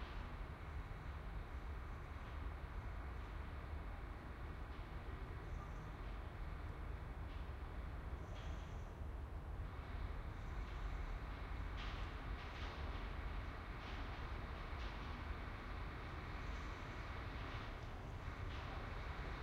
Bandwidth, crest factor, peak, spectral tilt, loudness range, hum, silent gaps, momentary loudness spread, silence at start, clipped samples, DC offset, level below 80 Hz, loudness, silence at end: 12 kHz; 12 dB; -34 dBFS; -6.5 dB/octave; 2 LU; none; none; 3 LU; 0 s; under 0.1%; under 0.1%; -50 dBFS; -50 LUFS; 0 s